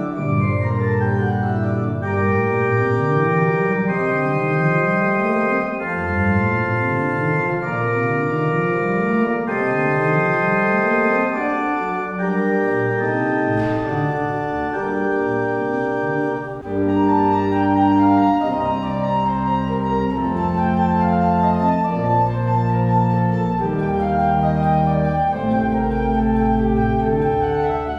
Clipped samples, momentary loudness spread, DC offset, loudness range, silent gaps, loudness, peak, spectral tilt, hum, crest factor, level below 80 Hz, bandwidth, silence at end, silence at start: under 0.1%; 4 LU; under 0.1%; 2 LU; none; -19 LUFS; -4 dBFS; -9 dB/octave; none; 14 dB; -38 dBFS; 7.4 kHz; 0 s; 0 s